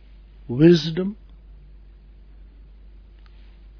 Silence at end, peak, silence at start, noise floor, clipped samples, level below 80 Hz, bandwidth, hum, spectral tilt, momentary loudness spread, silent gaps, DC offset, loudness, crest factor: 2.65 s; -2 dBFS; 0.5 s; -46 dBFS; under 0.1%; -46 dBFS; 5.4 kHz; none; -7.5 dB/octave; 17 LU; none; under 0.1%; -19 LUFS; 22 dB